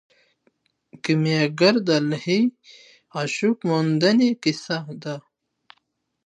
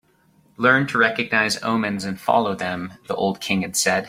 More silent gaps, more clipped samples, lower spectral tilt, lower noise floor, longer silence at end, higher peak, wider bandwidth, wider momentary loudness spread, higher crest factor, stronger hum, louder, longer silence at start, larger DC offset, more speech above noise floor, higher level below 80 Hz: neither; neither; first, -5.5 dB/octave vs -3.5 dB/octave; first, -72 dBFS vs -58 dBFS; first, 1.05 s vs 0 s; about the same, -4 dBFS vs -2 dBFS; second, 10.5 kHz vs 16.5 kHz; first, 14 LU vs 9 LU; about the same, 20 dB vs 20 dB; neither; about the same, -21 LUFS vs -21 LUFS; first, 0.95 s vs 0.6 s; neither; first, 51 dB vs 37 dB; second, -70 dBFS vs -60 dBFS